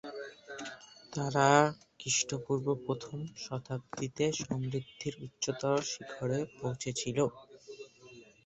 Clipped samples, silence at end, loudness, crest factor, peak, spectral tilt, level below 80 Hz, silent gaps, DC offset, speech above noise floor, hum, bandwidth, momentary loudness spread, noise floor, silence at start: under 0.1%; 0.25 s; -33 LUFS; 26 dB; -10 dBFS; -4 dB/octave; -68 dBFS; none; under 0.1%; 23 dB; none; 8.4 kHz; 17 LU; -56 dBFS; 0.05 s